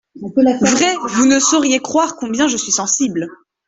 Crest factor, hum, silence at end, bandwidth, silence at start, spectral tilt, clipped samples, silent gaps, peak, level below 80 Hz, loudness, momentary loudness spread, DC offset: 14 dB; none; 0.35 s; 8.4 kHz; 0.15 s; -2.5 dB/octave; under 0.1%; none; -2 dBFS; -54 dBFS; -15 LUFS; 8 LU; under 0.1%